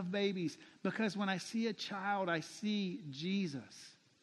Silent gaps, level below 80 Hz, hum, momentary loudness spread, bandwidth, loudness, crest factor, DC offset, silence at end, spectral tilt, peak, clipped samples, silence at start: none; -86 dBFS; none; 8 LU; 12 kHz; -39 LUFS; 18 dB; under 0.1%; 0.3 s; -5 dB/octave; -22 dBFS; under 0.1%; 0 s